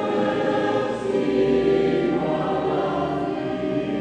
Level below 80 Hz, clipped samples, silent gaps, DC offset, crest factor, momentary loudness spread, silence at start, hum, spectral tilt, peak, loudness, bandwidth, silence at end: -50 dBFS; under 0.1%; none; under 0.1%; 12 dB; 6 LU; 0 s; none; -7 dB/octave; -8 dBFS; -22 LUFS; 9.4 kHz; 0 s